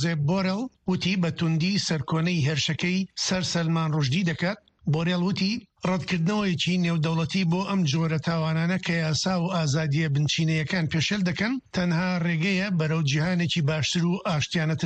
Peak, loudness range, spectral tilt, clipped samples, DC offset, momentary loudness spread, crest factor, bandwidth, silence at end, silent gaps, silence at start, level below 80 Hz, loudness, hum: -12 dBFS; 1 LU; -5.5 dB/octave; under 0.1%; under 0.1%; 3 LU; 12 dB; 8.6 kHz; 0 s; none; 0 s; -56 dBFS; -25 LUFS; none